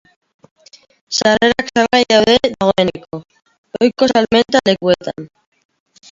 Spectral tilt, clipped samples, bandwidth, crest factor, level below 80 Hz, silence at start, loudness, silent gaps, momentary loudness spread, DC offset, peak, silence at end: -4 dB/octave; under 0.1%; 7.8 kHz; 16 dB; -48 dBFS; 1.1 s; -14 LUFS; 3.58-3.64 s; 19 LU; under 0.1%; 0 dBFS; 0.85 s